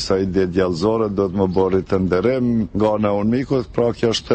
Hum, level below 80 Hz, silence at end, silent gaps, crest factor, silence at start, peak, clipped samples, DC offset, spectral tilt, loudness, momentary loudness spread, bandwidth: none; -42 dBFS; 0 s; none; 14 dB; 0 s; -4 dBFS; under 0.1%; under 0.1%; -6.5 dB/octave; -19 LUFS; 2 LU; 8.8 kHz